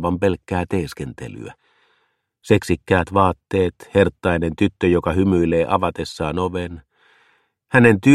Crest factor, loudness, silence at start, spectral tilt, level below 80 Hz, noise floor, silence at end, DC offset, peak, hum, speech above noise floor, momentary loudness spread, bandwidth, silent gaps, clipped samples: 18 dB; -19 LUFS; 0 s; -7 dB/octave; -42 dBFS; -67 dBFS; 0 s; under 0.1%; 0 dBFS; none; 49 dB; 15 LU; 13.5 kHz; none; under 0.1%